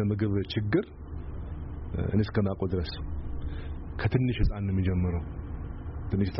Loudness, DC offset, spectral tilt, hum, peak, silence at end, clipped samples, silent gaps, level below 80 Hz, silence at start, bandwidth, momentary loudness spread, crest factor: -31 LUFS; under 0.1%; -7 dB/octave; none; -14 dBFS; 0 s; under 0.1%; none; -38 dBFS; 0 s; 5.8 kHz; 12 LU; 16 dB